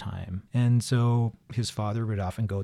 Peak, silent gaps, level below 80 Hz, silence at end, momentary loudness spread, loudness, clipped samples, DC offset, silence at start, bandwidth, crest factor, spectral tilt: -14 dBFS; none; -54 dBFS; 0 s; 8 LU; -28 LUFS; under 0.1%; under 0.1%; 0 s; 12.5 kHz; 12 dB; -6.5 dB/octave